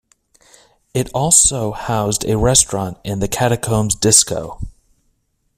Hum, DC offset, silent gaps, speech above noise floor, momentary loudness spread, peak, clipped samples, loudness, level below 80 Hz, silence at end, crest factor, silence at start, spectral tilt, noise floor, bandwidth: none; under 0.1%; none; 48 dB; 15 LU; 0 dBFS; under 0.1%; -15 LUFS; -36 dBFS; 0.9 s; 18 dB; 0.95 s; -3.5 dB/octave; -65 dBFS; 16 kHz